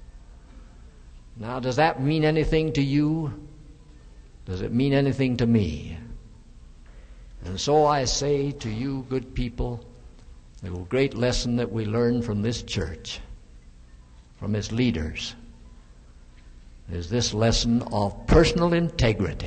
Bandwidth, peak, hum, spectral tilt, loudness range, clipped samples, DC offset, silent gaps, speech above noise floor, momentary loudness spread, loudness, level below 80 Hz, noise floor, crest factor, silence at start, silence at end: 9.2 kHz; -4 dBFS; none; -5.5 dB/octave; 6 LU; under 0.1%; under 0.1%; none; 25 dB; 16 LU; -25 LUFS; -38 dBFS; -49 dBFS; 22 dB; 0 s; 0 s